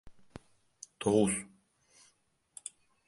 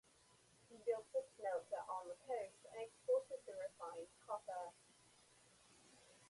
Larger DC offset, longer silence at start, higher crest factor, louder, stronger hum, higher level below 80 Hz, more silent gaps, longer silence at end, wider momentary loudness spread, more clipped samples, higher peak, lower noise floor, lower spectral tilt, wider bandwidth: neither; second, 0.05 s vs 0.7 s; about the same, 22 dB vs 18 dB; first, -31 LUFS vs -47 LUFS; neither; first, -64 dBFS vs -88 dBFS; neither; first, 1.6 s vs 0 s; about the same, 26 LU vs 26 LU; neither; first, -14 dBFS vs -30 dBFS; about the same, -72 dBFS vs -72 dBFS; first, -5 dB/octave vs -3 dB/octave; about the same, 11.5 kHz vs 11.5 kHz